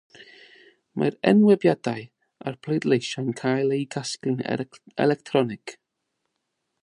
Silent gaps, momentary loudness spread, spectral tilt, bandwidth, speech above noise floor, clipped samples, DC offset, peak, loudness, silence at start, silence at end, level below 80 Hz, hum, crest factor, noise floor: none; 17 LU; -6 dB/octave; 11 kHz; 56 dB; under 0.1%; under 0.1%; -4 dBFS; -24 LUFS; 0.2 s; 1.1 s; -70 dBFS; none; 20 dB; -79 dBFS